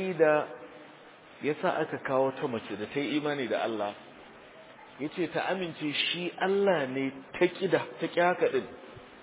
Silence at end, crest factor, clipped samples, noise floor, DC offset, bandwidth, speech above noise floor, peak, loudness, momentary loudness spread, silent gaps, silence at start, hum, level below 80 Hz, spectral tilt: 0 s; 20 dB; under 0.1%; -52 dBFS; under 0.1%; 4 kHz; 23 dB; -12 dBFS; -30 LUFS; 23 LU; none; 0 s; none; -74 dBFS; -3 dB/octave